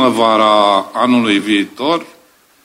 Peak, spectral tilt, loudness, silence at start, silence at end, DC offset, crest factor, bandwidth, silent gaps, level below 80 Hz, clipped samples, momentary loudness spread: 0 dBFS; -4.5 dB/octave; -13 LUFS; 0 s; 0.6 s; under 0.1%; 14 dB; 15 kHz; none; -62 dBFS; under 0.1%; 7 LU